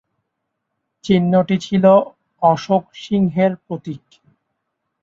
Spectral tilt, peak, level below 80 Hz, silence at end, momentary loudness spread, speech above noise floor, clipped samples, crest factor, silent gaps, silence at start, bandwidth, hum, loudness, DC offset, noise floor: -7.5 dB/octave; -2 dBFS; -56 dBFS; 1.05 s; 18 LU; 60 dB; under 0.1%; 18 dB; none; 1.05 s; 7.4 kHz; none; -16 LUFS; under 0.1%; -76 dBFS